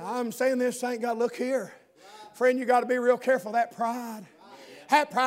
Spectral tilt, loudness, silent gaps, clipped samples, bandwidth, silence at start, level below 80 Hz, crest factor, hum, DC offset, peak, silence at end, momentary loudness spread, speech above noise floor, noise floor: -3.5 dB/octave; -27 LUFS; none; under 0.1%; 16 kHz; 0 s; -86 dBFS; 20 dB; none; under 0.1%; -8 dBFS; 0 s; 15 LU; 24 dB; -50 dBFS